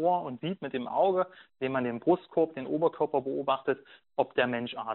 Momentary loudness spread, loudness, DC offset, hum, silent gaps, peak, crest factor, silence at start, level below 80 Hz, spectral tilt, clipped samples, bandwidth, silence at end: 8 LU; -30 LUFS; under 0.1%; none; none; -10 dBFS; 20 dB; 0 s; -72 dBFS; -4 dB/octave; under 0.1%; 4.2 kHz; 0 s